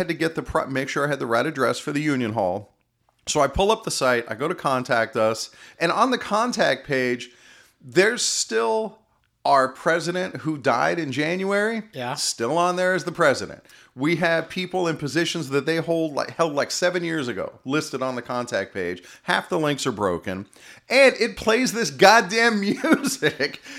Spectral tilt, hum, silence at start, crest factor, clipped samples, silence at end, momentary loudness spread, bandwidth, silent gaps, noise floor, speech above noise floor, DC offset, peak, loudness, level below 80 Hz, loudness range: -4 dB/octave; none; 0 s; 22 dB; under 0.1%; 0 s; 9 LU; 16 kHz; none; -67 dBFS; 45 dB; under 0.1%; 0 dBFS; -22 LUFS; -50 dBFS; 6 LU